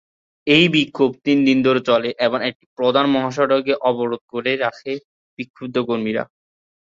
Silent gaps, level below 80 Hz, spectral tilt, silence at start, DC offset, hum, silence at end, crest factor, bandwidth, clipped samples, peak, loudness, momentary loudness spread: 2.55-2.60 s, 2.66-2.76 s, 4.21-4.28 s, 5.05-5.37 s, 5.50-5.54 s; -60 dBFS; -6 dB/octave; 0.45 s; under 0.1%; none; 0.6 s; 18 dB; 7.6 kHz; under 0.1%; -2 dBFS; -18 LUFS; 14 LU